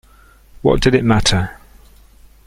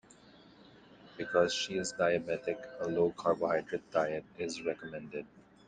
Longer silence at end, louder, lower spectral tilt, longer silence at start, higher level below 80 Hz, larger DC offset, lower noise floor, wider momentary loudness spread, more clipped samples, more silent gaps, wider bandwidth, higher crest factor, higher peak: first, 0.95 s vs 0.3 s; first, -15 LUFS vs -34 LUFS; about the same, -5 dB/octave vs -4 dB/octave; first, 0.65 s vs 0.45 s; first, -30 dBFS vs -70 dBFS; neither; second, -47 dBFS vs -59 dBFS; second, 7 LU vs 13 LU; neither; neither; first, 16 kHz vs 9.6 kHz; about the same, 18 dB vs 20 dB; first, 0 dBFS vs -14 dBFS